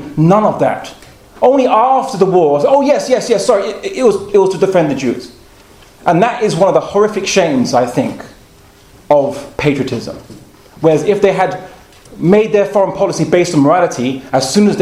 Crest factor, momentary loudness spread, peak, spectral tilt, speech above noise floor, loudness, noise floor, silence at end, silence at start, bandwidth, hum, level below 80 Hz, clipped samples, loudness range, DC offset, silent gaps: 12 dB; 9 LU; 0 dBFS; -5.5 dB/octave; 31 dB; -12 LUFS; -42 dBFS; 0 s; 0 s; 15 kHz; none; -48 dBFS; 0.1%; 4 LU; under 0.1%; none